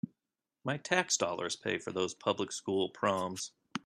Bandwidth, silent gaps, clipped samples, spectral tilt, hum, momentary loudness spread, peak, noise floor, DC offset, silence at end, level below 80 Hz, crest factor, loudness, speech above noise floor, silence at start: 13 kHz; none; under 0.1%; -3 dB/octave; none; 10 LU; -12 dBFS; under -90 dBFS; under 0.1%; 0.05 s; -78 dBFS; 24 dB; -34 LUFS; over 56 dB; 0.05 s